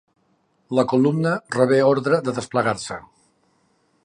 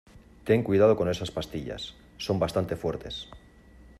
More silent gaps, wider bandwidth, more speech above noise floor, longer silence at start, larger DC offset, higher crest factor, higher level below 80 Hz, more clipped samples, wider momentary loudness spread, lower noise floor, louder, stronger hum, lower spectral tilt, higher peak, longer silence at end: neither; second, 11 kHz vs 14 kHz; first, 45 dB vs 26 dB; first, 0.7 s vs 0.15 s; neither; about the same, 18 dB vs 20 dB; second, -62 dBFS vs -52 dBFS; neither; second, 10 LU vs 17 LU; first, -65 dBFS vs -53 dBFS; first, -20 LUFS vs -27 LUFS; neither; about the same, -6.5 dB/octave vs -6.5 dB/octave; first, -4 dBFS vs -8 dBFS; first, 1.05 s vs 0.6 s